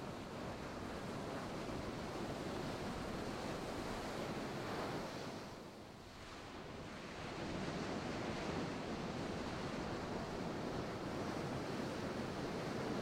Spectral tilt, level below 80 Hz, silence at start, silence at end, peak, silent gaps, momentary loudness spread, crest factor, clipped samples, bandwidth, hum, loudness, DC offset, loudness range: -5.5 dB/octave; -60 dBFS; 0 s; 0 s; -30 dBFS; none; 7 LU; 14 dB; under 0.1%; 16.5 kHz; none; -45 LUFS; under 0.1%; 3 LU